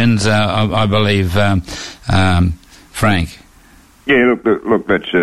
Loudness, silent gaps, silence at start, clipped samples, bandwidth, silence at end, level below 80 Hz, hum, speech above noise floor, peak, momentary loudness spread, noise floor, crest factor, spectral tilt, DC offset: -15 LUFS; none; 0 s; under 0.1%; 13 kHz; 0 s; -32 dBFS; none; 32 dB; -2 dBFS; 13 LU; -45 dBFS; 12 dB; -6 dB/octave; under 0.1%